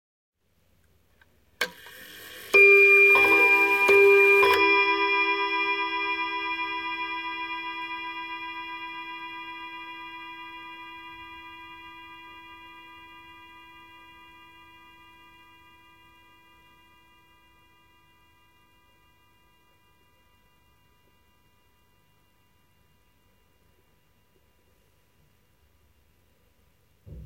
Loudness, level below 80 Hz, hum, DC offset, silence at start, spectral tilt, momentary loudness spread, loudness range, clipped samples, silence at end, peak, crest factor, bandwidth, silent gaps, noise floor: -20 LUFS; -64 dBFS; 50 Hz at -70 dBFS; under 0.1%; 1.6 s; -3 dB/octave; 28 LU; 26 LU; under 0.1%; 0 s; -8 dBFS; 20 dB; 16.5 kHz; none; -67 dBFS